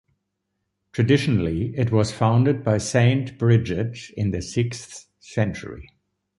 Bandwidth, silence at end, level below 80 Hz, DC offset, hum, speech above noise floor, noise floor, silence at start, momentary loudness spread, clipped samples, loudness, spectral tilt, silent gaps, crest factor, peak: 11.5 kHz; 0.55 s; -44 dBFS; under 0.1%; none; 56 dB; -77 dBFS; 0.95 s; 16 LU; under 0.1%; -22 LUFS; -6.5 dB/octave; none; 18 dB; -4 dBFS